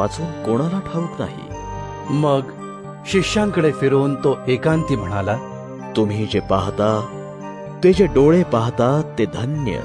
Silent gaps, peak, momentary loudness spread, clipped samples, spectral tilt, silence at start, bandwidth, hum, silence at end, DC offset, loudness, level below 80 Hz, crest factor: none; -2 dBFS; 17 LU; under 0.1%; -7 dB/octave; 0 s; 10.5 kHz; none; 0 s; under 0.1%; -19 LUFS; -40 dBFS; 16 dB